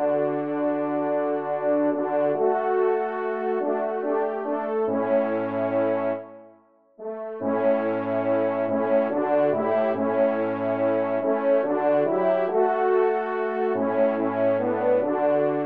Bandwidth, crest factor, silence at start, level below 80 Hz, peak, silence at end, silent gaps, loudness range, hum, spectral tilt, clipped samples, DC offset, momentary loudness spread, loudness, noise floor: 4.4 kHz; 12 dB; 0 s; -78 dBFS; -10 dBFS; 0 s; none; 3 LU; none; -10 dB/octave; under 0.1%; 0.1%; 4 LU; -24 LUFS; -56 dBFS